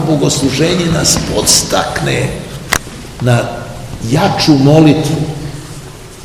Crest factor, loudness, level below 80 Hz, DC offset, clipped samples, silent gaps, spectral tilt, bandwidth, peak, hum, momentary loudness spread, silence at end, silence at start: 12 dB; -11 LUFS; -32 dBFS; under 0.1%; 0.7%; none; -4.5 dB/octave; over 20 kHz; 0 dBFS; none; 18 LU; 0 s; 0 s